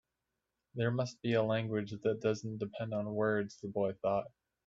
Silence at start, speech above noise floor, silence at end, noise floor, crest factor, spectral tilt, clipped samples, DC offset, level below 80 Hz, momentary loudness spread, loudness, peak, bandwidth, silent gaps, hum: 0.75 s; 53 dB; 0.4 s; -87 dBFS; 16 dB; -7 dB/octave; under 0.1%; under 0.1%; -72 dBFS; 7 LU; -35 LUFS; -20 dBFS; 7.8 kHz; none; none